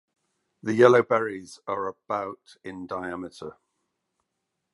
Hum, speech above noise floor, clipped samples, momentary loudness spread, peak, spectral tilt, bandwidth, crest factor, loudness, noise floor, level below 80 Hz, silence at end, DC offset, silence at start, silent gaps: none; 56 dB; under 0.1%; 23 LU; -2 dBFS; -6 dB/octave; 11.5 kHz; 26 dB; -24 LUFS; -81 dBFS; -68 dBFS; 1.25 s; under 0.1%; 0.65 s; none